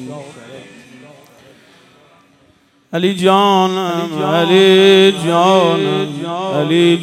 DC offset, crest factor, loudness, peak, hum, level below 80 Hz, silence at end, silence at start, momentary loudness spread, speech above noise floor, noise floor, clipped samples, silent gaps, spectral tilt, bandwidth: under 0.1%; 14 dB; -12 LUFS; 0 dBFS; none; -64 dBFS; 0 s; 0 s; 13 LU; 40 dB; -53 dBFS; under 0.1%; none; -5.5 dB/octave; 13.5 kHz